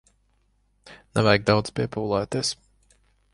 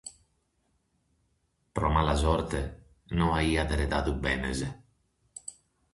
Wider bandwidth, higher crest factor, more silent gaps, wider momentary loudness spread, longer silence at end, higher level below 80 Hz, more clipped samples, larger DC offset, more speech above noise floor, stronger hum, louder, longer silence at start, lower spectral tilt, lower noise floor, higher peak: about the same, 11.5 kHz vs 11.5 kHz; about the same, 22 dB vs 22 dB; neither; second, 9 LU vs 17 LU; first, 0.8 s vs 0.4 s; second, -52 dBFS vs -36 dBFS; neither; neither; about the same, 43 dB vs 46 dB; first, 50 Hz at -45 dBFS vs none; first, -24 LUFS vs -29 LUFS; first, 0.85 s vs 0.05 s; about the same, -5 dB/octave vs -5.5 dB/octave; second, -66 dBFS vs -74 dBFS; first, -4 dBFS vs -10 dBFS